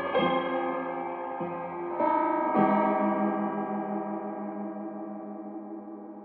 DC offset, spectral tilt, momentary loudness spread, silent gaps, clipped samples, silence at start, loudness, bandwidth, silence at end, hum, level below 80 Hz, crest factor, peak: under 0.1%; -5 dB/octave; 15 LU; none; under 0.1%; 0 s; -29 LUFS; 4.5 kHz; 0 s; none; -74 dBFS; 20 dB; -10 dBFS